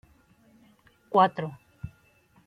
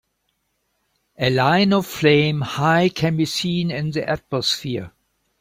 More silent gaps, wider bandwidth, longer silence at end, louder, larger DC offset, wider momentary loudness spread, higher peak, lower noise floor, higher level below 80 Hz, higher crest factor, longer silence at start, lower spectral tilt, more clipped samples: neither; second, 10.5 kHz vs 16.5 kHz; about the same, 0.6 s vs 0.5 s; second, -25 LUFS vs -19 LUFS; neither; first, 22 LU vs 8 LU; second, -8 dBFS vs -4 dBFS; second, -62 dBFS vs -71 dBFS; second, -62 dBFS vs -54 dBFS; first, 24 dB vs 18 dB; about the same, 1.1 s vs 1.2 s; first, -7.5 dB/octave vs -5.5 dB/octave; neither